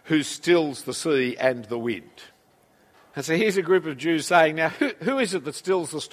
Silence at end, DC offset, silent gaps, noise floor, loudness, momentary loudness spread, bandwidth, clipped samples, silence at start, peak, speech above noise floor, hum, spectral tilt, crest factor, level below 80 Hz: 0.05 s; under 0.1%; none; -60 dBFS; -23 LUFS; 9 LU; 15.5 kHz; under 0.1%; 0.05 s; -4 dBFS; 36 dB; none; -4.5 dB/octave; 20 dB; -70 dBFS